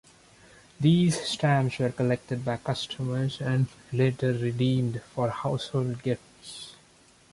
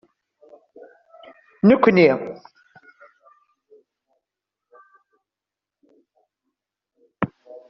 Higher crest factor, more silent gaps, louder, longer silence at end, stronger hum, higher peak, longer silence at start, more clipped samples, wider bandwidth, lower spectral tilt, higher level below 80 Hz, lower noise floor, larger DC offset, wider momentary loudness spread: second, 16 dB vs 22 dB; neither; second, -27 LUFS vs -18 LUFS; first, 0.6 s vs 0.45 s; neither; second, -12 dBFS vs -2 dBFS; second, 0.8 s vs 1.65 s; neither; first, 11.5 kHz vs 6 kHz; about the same, -6.5 dB/octave vs -6 dB/octave; about the same, -60 dBFS vs -64 dBFS; second, -58 dBFS vs -88 dBFS; neither; second, 8 LU vs 19 LU